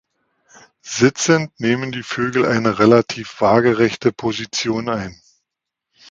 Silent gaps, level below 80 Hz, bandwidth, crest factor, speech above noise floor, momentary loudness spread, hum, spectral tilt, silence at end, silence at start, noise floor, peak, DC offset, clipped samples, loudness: none; -54 dBFS; 9.2 kHz; 18 dB; 65 dB; 11 LU; none; -5 dB/octave; 1 s; 0.85 s; -82 dBFS; 0 dBFS; under 0.1%; under 0.1%; -17 LUFS